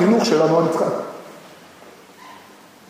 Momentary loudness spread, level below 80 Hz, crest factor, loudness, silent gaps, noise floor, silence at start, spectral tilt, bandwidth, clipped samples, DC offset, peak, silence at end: 26 LU; -72 dBFS; 18 dB; -18 LUFS; none; -46 dBFS; 0 s; -6 dB/octave; 15.5 kHz; under 0.1%; under 0.1%; -2 dBFS; 0.55 s